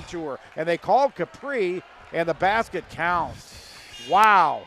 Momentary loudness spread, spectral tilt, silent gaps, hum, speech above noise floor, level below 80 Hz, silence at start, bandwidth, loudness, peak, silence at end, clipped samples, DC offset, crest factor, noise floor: 21 LU; -4.5 dB/octave; none; none; 21 dB; -54 dBFS; 0 s; 14 kHz; -23 LUFS; -4 dBFS; 0 s; under 0.1%; under 0.1%; 18 dB; -43 dBFS